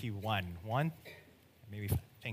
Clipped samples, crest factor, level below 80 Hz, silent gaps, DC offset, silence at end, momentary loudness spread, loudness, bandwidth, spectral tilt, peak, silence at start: under 0.1%; 20 dB; -58 dBFS; none; under 0.1%; 0 s; 17 LU; -38 LUFS; 15.5 kHz; -6 dB/octave; -18 dBFS; 0 s